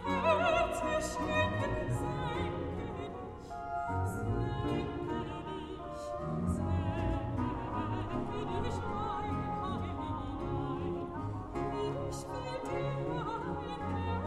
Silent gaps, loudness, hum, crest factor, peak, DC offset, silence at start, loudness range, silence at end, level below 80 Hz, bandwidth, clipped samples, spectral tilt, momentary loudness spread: none; -36 LUFS; none; 18 dB; -16 dBFS; under 0.1%; 0 s; 3 LU; 0 s; -48 dBFS; 13.5 kHz; under 0.1%; -6.5 dB/octave; 8 LU